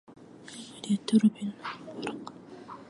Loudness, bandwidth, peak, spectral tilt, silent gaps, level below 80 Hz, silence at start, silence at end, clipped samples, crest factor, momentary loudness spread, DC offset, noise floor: -30 LUFS; 11 kHz; -12 dBFS; -6 dB/octave; none; -76 dBFS; 0.1 s; 0.05 s; under 0.1%; 20 dB; 21 LU; under 0.1%; -47 dBFS